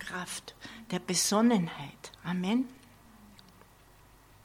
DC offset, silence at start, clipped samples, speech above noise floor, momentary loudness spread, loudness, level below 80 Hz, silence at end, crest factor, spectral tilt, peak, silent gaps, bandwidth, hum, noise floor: under 0.1%; 0 s; under 0.1%; 27 dB; 19 LU; -30 LUFS; -64 dBFS; 1.2 s; 20 dB; -4 dB/octave; -14 dBFS; none; 16.5 kHz; none; -58 dBFS